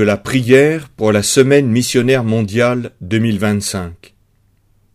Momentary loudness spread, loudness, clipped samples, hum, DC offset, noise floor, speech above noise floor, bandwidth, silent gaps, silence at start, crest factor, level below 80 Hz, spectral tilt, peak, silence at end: 9 LU; -14 LUFS; under 0.1%; none; under 0.1%; -56 dBFS; 42 dB; 15.5 kHz; none; 0 s; 14 dB; -48 dBFS; -5 dB/octave; 0 dBFS; 1 s